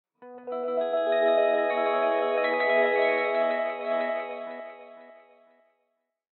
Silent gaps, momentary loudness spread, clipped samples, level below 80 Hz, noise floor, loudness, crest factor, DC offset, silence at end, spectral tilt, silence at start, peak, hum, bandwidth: none; 15 LU; under 0.1%; under -90 dBFS; -78 dBFS; -25 LUFS; 16 dB; under 0.1%; 1.25 s; -6 dB/octave; 0.2 s; -12 dBFS; none; 4.4 kHz